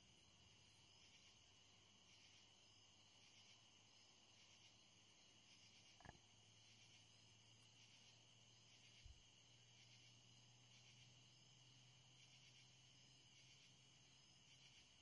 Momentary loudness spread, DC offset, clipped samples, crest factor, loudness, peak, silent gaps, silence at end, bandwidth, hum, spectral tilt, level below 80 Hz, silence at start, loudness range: 2 LU; under 0.1%; under 0.1%; 26 dB; -68 LUFS; -44 dBFS; none; 0 s; 10.5 kHz; none; -2 dB/octave; -86 dBFS; 0 s; 1 LU